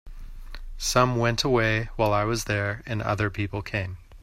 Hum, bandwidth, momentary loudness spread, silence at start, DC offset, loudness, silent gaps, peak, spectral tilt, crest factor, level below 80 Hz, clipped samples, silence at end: none; 16 kHz; 11 LU; 0.05 s; under 0.1%; -25 LUFS; none; -6 dBFS; -4.5 dB/octave; 18 dB; -40 dBFS; under 0.1%; 0 s